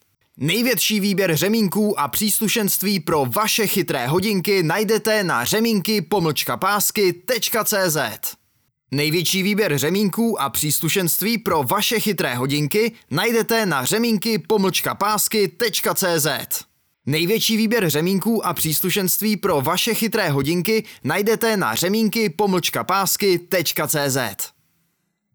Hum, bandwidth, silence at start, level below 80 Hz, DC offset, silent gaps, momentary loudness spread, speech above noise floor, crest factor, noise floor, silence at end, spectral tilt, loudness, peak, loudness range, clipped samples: none; over 20 kHz; 0.35 s; -58 dBFS; under 0.1%; none; 4 LU; 51 dB; 12 dB; -70 dBFS; 0.85 s; -3.5 dB/octave; -19 LUFS; -8 dBFS; 1 LU; under 0.1%